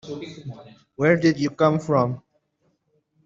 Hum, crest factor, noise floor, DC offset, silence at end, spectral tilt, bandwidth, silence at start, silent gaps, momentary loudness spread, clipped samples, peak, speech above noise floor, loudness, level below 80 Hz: none; 20 dB; -70 dBFS; under 0.1%; 1.05 s; -7 dB/octave; 7.6 kHz; 0.05 s; none; 20 LU; under 0.1%; -4 dBFS; 47 dB; -21 LUFS; -62 dBFS